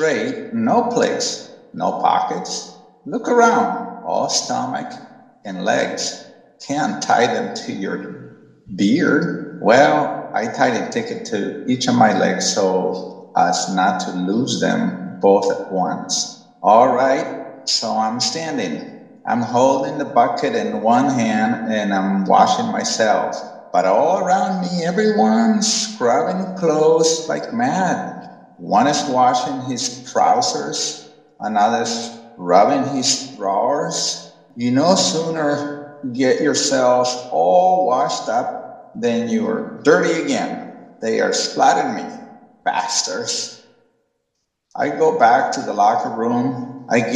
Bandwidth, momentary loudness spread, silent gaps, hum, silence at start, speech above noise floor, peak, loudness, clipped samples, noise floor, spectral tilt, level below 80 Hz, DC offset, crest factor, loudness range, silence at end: 12 kHz; 13 LU; none; none; 0 s; 56 dB; 0 dBFS; -18 LUFS; under 0.1%; -74 dBFS; -4 dB/octave; -68 dBFS; under 0.1%; 18 dB; 3 LU; 0 s